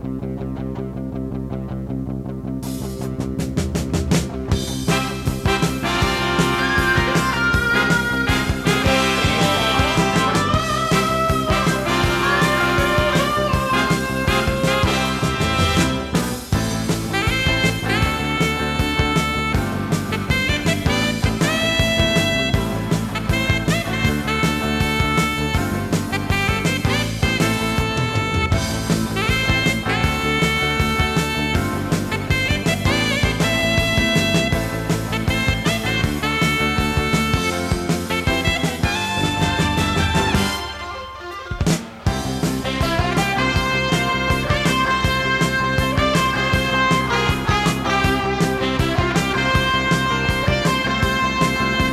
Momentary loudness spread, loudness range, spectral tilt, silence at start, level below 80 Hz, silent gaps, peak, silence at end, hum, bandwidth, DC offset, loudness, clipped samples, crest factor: 6 LU; 3 LU; -4.5 dB/octave; 0 s; -32 dBFS; none; -4 dBFS; 0 s; none; 16 kHz; under 0.1%; -19 LUFS; under 0.1%; 16 dB